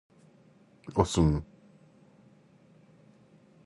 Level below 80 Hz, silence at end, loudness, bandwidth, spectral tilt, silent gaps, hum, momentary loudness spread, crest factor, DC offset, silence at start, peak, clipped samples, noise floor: -44 dBFS; 2.2 s; -28 LUFS; 11.5 kHz; -6.5 dB/octave; none; none; 25 LU; 24 dB; under 0.1%; 0.85 s; -10 dBFS; under 0.1%; -60 dBFS